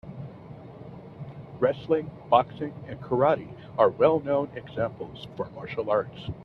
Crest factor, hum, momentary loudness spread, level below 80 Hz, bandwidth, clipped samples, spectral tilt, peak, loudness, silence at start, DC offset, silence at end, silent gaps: 22 dB; none; 19 LU; -58 dBFS; 6 kHz; under 0.1%; -9 dB/octave; -4 dBFS; -27 LUFS; 0.05 s; under 0.1%; 0 s; none